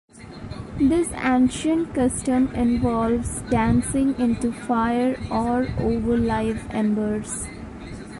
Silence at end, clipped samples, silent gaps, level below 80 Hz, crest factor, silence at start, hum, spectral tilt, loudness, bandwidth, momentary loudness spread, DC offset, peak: 0 s; under 0.1%; none; -38 dBFS; 14 dB; 0.15 s; none; -6 dB/octave; -22 LUFS; 11.5 kHz; 14 LU; under 0.1%; -8 dBFS